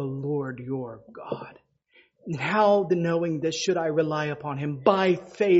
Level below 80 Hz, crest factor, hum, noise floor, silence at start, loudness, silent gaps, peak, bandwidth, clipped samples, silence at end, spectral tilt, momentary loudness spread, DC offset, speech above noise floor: -66 dBFS; 22 dB; none; -62 dBFS; 0 s; -26 LUFS; none; -4 dBFS; 8 kHz; under 0.1%; 0 s; -5 dB/octave; 15 LU; under 0.1%; 38 dB